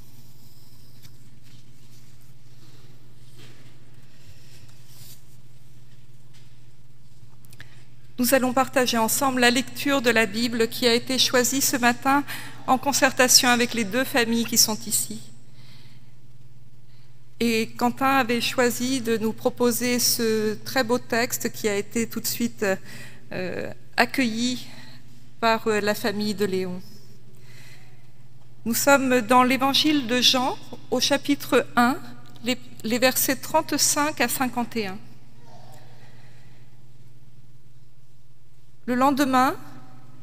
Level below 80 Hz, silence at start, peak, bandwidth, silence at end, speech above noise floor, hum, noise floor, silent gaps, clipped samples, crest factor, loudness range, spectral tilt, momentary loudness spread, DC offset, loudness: -64 dBFS; 3.4 s; 0 dBFS; 16 kHz; 0.45 s; 34 dB; none; -56 dBFS; none; under 0.1%; 24 dB; 8 LU; -2.5 dB/octave; 12 LU; 2%; -22 LUFS